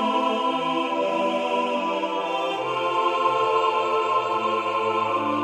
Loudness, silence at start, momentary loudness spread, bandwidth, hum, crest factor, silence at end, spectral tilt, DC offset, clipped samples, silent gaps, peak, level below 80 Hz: -23 LUFS; 0 s; 4 LU; 12 kHz; none; 14 dB; 0 s; -4.5 dB/octave; under 0.1%; under 0.1%; none; -8 dBFS; -74 dBFS